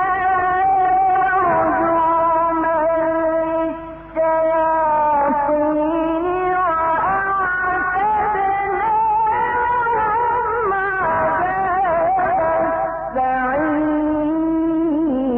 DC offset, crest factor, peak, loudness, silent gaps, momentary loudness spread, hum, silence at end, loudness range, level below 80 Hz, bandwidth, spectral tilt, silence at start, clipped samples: under 0.1%; 8 dB; -10 dBFS; -18 LUFS; none; 3 LU; none; 0 s; 2 LU; -44 dBFS; 3.8 kHz; -10 dB/octave; 0 s; under 0.1%